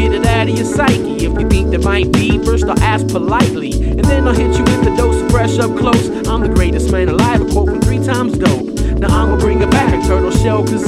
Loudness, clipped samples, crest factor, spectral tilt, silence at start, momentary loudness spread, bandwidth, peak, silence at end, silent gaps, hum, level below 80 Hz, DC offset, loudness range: -13 LUFS; under 0.1%; 12 dB; -6 dB/octave; 0 s; 3 LU; 15 kHz; 0 dBFS; 0 s; none; none; -18 dBFS; under 0.1%; 1 LU